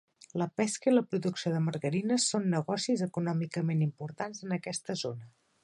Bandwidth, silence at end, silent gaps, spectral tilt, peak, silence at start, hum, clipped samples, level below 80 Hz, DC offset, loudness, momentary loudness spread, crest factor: 11.5 kHz; 0.35 s; none; -5 dB/octave; -14 dBFS; 0.35 s; none; under 0.1%; -76 dBFS; under 0.1%; -31 LUFS; 10 LU; 18 dB